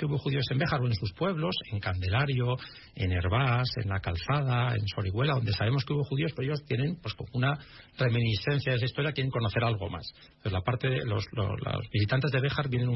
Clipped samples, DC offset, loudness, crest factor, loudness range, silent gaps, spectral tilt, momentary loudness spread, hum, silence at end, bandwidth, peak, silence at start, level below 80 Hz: under 0.1%; under 0.1%; -30 LUFS; 14 dB; 2 LU; none; -8 dB/octave; 7 LU; none; 0 s; 6 kHz; -16 dBFS; 0 s; -54 dBFS